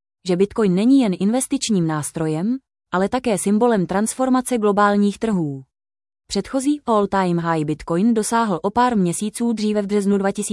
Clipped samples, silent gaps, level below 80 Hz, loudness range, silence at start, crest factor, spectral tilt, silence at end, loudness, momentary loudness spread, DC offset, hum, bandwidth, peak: under 0.1%; none; -52 dBFS; 2 LU; 0.25 s; 16 dB; -5.5 dB/octave; 0 s; -19 LUFS; 7 LU; under 0.1%; none; 12 kHz; -4 dBFS